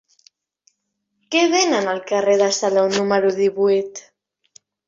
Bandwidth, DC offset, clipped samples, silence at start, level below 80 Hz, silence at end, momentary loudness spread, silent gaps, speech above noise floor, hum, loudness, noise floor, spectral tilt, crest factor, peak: 7.8 kHz; under 0.1%; under 0.1%; 1.3 s; -66 dBFS; 0.9 s; 6 LU; none; 57 dB; none; -18 LUFS; -74 dBFS; -3 dB/octave; 16 dB; -4 dBFS